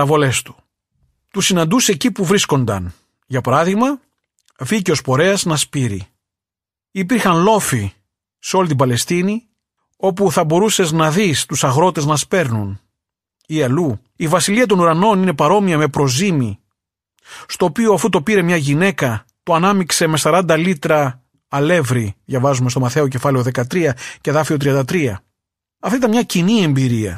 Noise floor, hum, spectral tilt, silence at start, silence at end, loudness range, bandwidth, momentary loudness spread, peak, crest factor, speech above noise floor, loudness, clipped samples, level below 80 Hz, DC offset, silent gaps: -89 dBFS; none; -5 dB/octave; 0 s; 0 s; 3 LU; 15 kHz; 10 LU; -2 dBFS; 14 dB; 74 dB; -16 LUFS; under 0.1%; -52 dBFS; under 0.1%; none